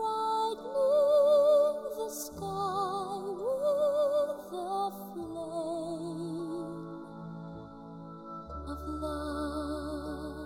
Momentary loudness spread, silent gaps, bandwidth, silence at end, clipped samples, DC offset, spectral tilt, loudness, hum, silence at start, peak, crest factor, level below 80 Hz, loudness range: 19 LU; none; 16 kHz; 0 s; under 0.1%; under 0.1%; -5.5 dB/octave; -31 LUFS; none; 0 s; -16 dBFS; 14 dB; -52 dBFS; 12 LU